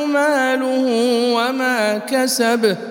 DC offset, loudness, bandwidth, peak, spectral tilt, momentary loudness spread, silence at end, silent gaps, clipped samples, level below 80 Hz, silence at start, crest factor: under 0.1%; -17 LUFS; 17.5 kHz; -4 dBFS; -3 dB/octave; 2 LU; 0 s; none; under 0.1%; -78 dBFS; 0 s; 14 dB